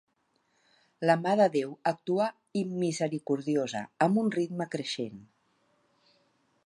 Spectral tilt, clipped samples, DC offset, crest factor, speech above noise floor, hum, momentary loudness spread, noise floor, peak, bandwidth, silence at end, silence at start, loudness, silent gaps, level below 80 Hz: -6 dB/octave; under 0.1%; under 0.1%; 20 dB; 45 dB; none; 9 LU; -74 dBFS; -10 dBFS; 11.5 kHz; 1.4 s; 1 s; -29 LUFS; none; -80 dBFS